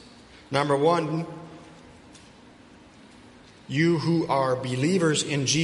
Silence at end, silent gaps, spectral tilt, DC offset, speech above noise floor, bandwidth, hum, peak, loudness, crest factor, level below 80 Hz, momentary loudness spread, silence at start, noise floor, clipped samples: 0 s; none; -5 dB/octave; under 0.1%; 27 dB; 11.5 kHz; none; -8 dBFS; -24 LUFS; 20 dB; -60 dBFS; 15 LU; 0.5 s; -51 dBFS; under 0.1%